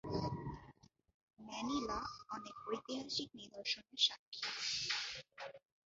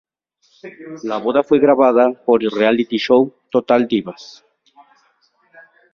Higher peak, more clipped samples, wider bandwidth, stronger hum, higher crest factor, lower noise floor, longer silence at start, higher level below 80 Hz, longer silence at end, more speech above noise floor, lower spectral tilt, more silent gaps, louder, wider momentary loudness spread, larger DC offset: second, -20 dBFS vs -2 dBFS; neither; first, 7.6 kHz vs 6.8 kHz; neither; first, 24 dB vs 16 dB; first, -65 dBFS vs -61 dBFS; second, 0.05 s vs 0.65 s; second, -66 dBFS vs -60 dBFS; second, 0.3 s vs 1.7 s; second, 23 dB vs 46 dB; second, -2 dB/octave vs -6.5 dB/octave; first, 1.14-1.28 s, 4.19-4.32 s vs none; second, -41 LUFS vs -16 LUFS; second, 15 LU vs 18 LU; neither